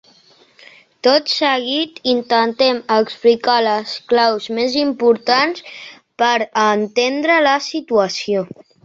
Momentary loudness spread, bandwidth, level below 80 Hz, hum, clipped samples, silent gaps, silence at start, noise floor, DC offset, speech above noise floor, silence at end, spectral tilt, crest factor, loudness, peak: 7 LU; 7.6 kHz; -64 dBFS; none; under 0.1%; none; 1.05 s; -51 dBFS; under 0.1%; 35 dB; 0.4 s; -3.5 dB/octave; 16 dB; -16 LUFS; -2 dBFS